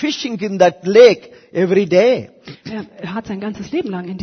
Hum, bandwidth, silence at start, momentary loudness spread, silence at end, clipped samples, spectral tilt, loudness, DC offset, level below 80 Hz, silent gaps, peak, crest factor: none; 6.6 kHz; 0 s; 20 LU; 0 s; under 0.1%; -5.5 dB/octave; -15 LUFS; under 0.1%; -58 dBFS; none; 0 dBFS; 16 dB